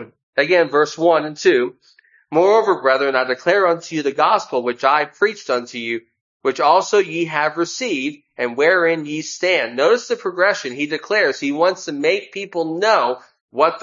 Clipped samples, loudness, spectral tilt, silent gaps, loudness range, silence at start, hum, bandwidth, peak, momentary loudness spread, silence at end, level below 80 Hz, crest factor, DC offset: under 0.1%; -18 LUFS; -3.5 dB/octave; 0.23-0.33 s, 6.21-6.40 s, 13.41-13.48 s; 2 LU; 0 s; none; 7.6 kHz; 0 dBFS; 9 LU; 0 s; -74 dBFS; 18 dB; under 0.1%